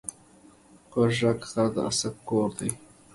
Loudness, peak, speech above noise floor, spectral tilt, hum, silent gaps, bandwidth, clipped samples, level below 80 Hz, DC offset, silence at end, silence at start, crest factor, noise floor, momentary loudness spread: -27 LUFS; -10 dBFS; 29 dB; -5 dB/octave; none; none; 12 kHz; under 0.1%; -58 dBFS; under 0.1%; 0.35 s; 0.05 s; 18 dB; -55 dBFS; 10 LU